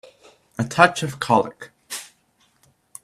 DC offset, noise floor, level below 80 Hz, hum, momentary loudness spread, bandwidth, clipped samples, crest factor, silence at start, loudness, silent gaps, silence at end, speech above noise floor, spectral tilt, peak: under 0.1%; -63 dBFS; -60 dBFS; none; 18 LU; 15 kHz; under 0.1%; 24 dB; 0.6 s; -20 LUFS; none; 1 s; 43 dB; -4.5 dB/octave; 0 dBFS